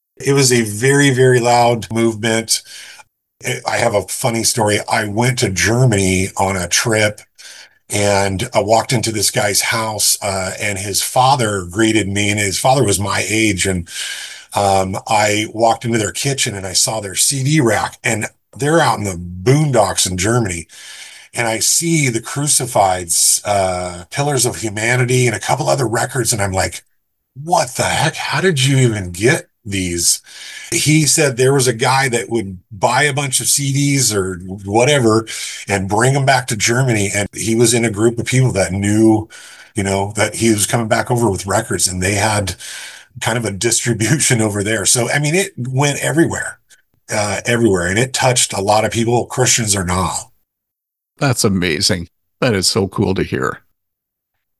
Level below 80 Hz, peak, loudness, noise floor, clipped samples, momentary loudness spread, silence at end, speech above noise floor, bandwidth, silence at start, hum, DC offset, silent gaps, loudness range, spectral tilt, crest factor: -40 dBFS; 0 dBFS; -15 LUFS; -80 dBFS; under 0.1%; 9 LU; 1 s; 64 dB; 13 kHz; 0.2 s; none; under 0.1%; none; 2 LU; -3.5 dB/octave; 16 dB